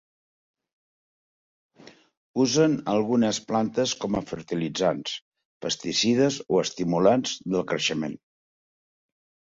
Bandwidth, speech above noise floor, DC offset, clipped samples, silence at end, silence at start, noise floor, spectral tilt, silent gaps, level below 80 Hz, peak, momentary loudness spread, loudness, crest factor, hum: 7.8 kHz; over 66 dB; under 0.1%; under 0.1%; 1.4 s; 1.85 s; under -90 dBFS; -4.5 dB/octave; 2.17-2.34 s, 5.22-5.32 s, 5.45-5.60 s; -62 dBFS; -8 dBFS; 11 LU; -25 LUFS; 20 dB; none